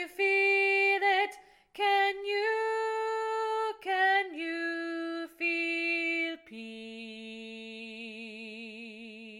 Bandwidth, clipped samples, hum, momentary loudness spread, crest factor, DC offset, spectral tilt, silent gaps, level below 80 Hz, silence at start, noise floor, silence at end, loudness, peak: 16 kHz; under 0.1%; none; 18 LU; 16 dB; under 0.1%; -2.5 dB/octave; none; -78 dBFS; 0 s; -51 dBFS; 0 s; -29 LUFS; -16 dBFS